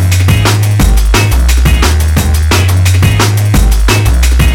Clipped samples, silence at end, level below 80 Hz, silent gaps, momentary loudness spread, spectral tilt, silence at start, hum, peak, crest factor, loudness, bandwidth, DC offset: 0.3%; 0 s; -10 dBFS; none; 1 LU; -4.5 dB/octave; 0 s; none; 0 dBFS; 6 dB; -9 LUFS; 18 kHz; under 0.1%